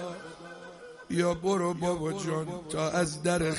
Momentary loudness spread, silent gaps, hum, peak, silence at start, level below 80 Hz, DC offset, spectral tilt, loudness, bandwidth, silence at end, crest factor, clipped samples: 17 LU; none; none; -14 dBFS; 0 s; -56 dBFS; under 0.1%; -5 dB/octave; -30 LUFS; 11.5 kHz; 0 s; 16 dB; under 0.1%